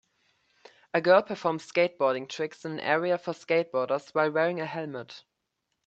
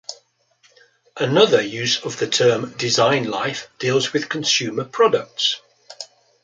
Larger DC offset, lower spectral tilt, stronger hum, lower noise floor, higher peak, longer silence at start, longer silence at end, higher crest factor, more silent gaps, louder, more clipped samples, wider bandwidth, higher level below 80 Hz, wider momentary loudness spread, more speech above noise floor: neither; first, -5.5 dB/octave vs -3 dB/octave; neither; first, -81 dBFS vs -59 dBFS; second, -8 dBFS vs -2 dBFS; first, 0.95 s vs 0.1 s; first, 0.65 s vs 0.4 s; about the same, 22 dB vs 20 dB; neither; second, -27 LUFS vs -19 LUFS; neither; second, 8 kHz vs 9.4 kHz; second, -78 dBFS vs -66 dBFS; about the same, 13 LU vs 13 LU; first, 54 dB vs 40 dB